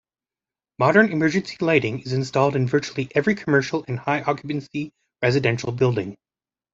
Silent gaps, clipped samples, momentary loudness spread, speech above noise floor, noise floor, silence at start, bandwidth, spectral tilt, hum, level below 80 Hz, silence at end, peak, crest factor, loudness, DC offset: none; under 0.1%; 10 LU; over 69 dB; under -90 dBFS; 0.8 s; 7.8 kHz; -6.5 dB/octave; none; -58 dBFS; 0.6 s; -2 dBFS; 20 dB; -22 LUFS; under 0.1%